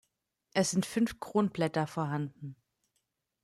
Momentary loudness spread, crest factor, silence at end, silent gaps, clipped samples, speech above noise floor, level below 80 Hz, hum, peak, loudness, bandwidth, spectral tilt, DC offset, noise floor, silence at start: 10 LU; 20 dB; 0.9 s; none; under 0.1%; 50 dB; -68 dBFS; none; -14 dBFS; -32 LUFS; 14 kHz; -5 dB/octave; under 0.1%; -81 dBFS; 0.55 s